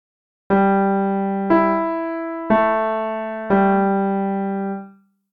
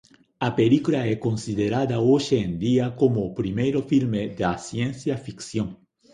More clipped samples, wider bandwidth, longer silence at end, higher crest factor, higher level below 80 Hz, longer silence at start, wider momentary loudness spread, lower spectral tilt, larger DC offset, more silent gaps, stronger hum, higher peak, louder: neither; second, 4.7 kHz vs 10.5 kHz; about the same, 0.45 s vs 0.4 s; about the same, 14 dB vs 16 dB; about the same, -56 dBFS vs -52 dBFS; about the same, 0.5 s vs 0.4 s; about the same, 9 LU vs 9 LU; first, -10.5 dB/octave vs -7 dB/octave; neither; neither; neither; about the same, -6 dBFS vs -6 dBFS; first, -19 LUFS vs -24 LUFS